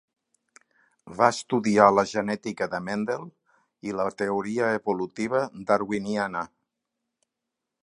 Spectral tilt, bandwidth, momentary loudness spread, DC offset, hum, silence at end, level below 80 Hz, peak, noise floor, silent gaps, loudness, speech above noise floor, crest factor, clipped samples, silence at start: -5.5 dB/octave; 11 kHz; 14 LU; under 0.1%; none; 1.4 s; -66 dBFS; -2 dBFS; -85 dBFS; none; -25 LUFS; 60 dB; 24 dB; under 0.1%; 1.05 s